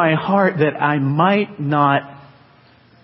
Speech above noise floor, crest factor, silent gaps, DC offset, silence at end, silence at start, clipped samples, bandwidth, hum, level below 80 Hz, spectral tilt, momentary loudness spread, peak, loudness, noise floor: 34 dB; 16 dB; none; under 0.1%; 0.85 s; 0 s; under 0.1%; 5.8 kHz; none; -62 dBFS; -12 dB/octave; 4 LU; -2 dBFS; -17 LUFS; -50 dBFS